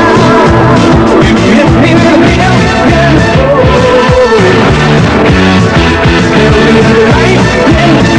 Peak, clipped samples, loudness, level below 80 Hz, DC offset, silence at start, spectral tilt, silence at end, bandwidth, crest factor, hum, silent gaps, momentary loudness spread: 0 dBFS; 4%; -5 LUFS; -18 dBFS; under 0.1%; 0 s; -6 dB/octave; 0 s; 11 kHz; 4 dB; none; none; 2 LU